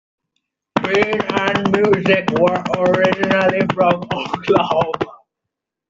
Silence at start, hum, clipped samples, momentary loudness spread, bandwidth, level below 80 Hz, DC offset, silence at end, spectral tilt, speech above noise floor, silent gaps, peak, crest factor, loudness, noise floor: 0.75 s; none; under 0.1%; 7 LU; 7.8 kHz; -52 dBFS; under 0.1%; 0.75 s; -6 dB/octave; 65 dB; none; -2 dBFS; 16 dB; -17 LUFS; -81 dBFS